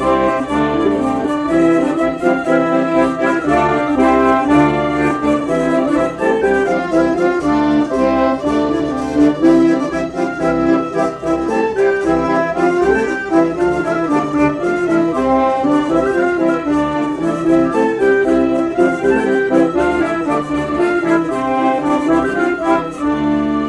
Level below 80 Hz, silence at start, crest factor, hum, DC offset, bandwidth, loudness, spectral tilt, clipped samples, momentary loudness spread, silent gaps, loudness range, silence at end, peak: -40 dBFS; 0 s; 12 dB; none; under 0.1%; 10.5 kHz; -15 LUFS; -6.5 dB/octave; under 0.1%; 5 LU; none; 2 LU; 0 s; -2 dBFS